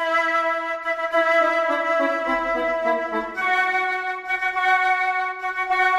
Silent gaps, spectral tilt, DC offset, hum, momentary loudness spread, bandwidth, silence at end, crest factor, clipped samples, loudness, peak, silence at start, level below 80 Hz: none; -2.5 dB/octave; under 0.1%; none; 6 LU; 13 kHz; 0 s; 14 dB; under 0.1%; -21 LUFS; -6 dBFS; 0 s; -56 dBFS